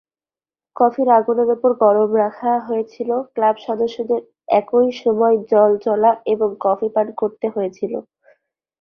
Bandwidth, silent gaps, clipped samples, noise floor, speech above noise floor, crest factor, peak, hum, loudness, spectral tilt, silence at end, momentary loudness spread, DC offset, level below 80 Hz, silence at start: 6.4 kHz; none; under 0.1%; under -90 dBFS; over 73 dB; 16 dB; -2 dBFS; none; -18 LUFS; -7.5 dB/octave; 0.8 s; 8 LU; under 0.1%; -66 dBFS; 0.75 s